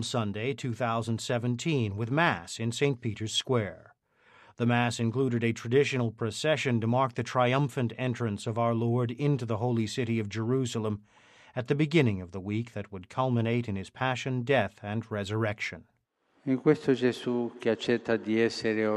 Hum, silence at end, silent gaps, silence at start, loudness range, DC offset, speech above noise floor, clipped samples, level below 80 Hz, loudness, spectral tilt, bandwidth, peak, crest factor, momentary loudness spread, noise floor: none; 0 s; none; 0 s; 3 LU; under 0.1%; 42 dB; under 0.1%; -68 dBFS; -29 LUFS; -6 dB/octave; 12.5 kHz; -10 dBFS; 20 dB; 8 LU; -71 dBFS